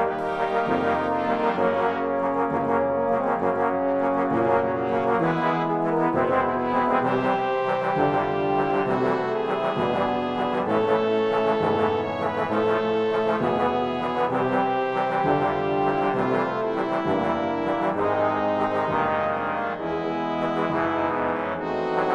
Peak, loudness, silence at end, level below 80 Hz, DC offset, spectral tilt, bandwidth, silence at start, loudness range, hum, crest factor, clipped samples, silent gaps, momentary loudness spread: -8 dBFS; -24 LUFS; 0 s; -58 dBFS; under 0.1%; -7.5 dB/octave; 9.2 kHz; 0 s; 2 LU; none; 14 dB; under 0.1%; none; 3 LU